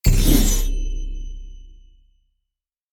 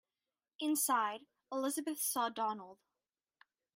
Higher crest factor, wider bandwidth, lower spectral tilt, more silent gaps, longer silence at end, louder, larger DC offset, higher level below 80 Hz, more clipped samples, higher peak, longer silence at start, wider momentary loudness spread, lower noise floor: about the same, 18 dB vs 18 dB; first, 18 kHz vs 16 kHz; first, -4.5 dB/octave vs -1.5 dB/octave; neither; first, 1.2 s vs 1 s; first, -21 LUFS vs -36 LUFS; neither; first, -22 dBFS vs under -90 dBFS; neither; first, -2 dBFS vs -22 dBFS; second, 0.05 s vs 0.6 s; first, 23 LU vs 14 LU; second, -82 dBFS vs under -90 dBFS